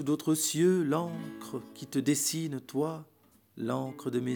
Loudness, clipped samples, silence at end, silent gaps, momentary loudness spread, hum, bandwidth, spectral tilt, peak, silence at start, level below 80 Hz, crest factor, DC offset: -31 LUFS; under 0.1%; 0 s; none; 15 LU; none; over 20 kHz; -4.5 dB/octave; -16 dBFS; 0 s; -80 dBFS; 16 dB; under 0.1%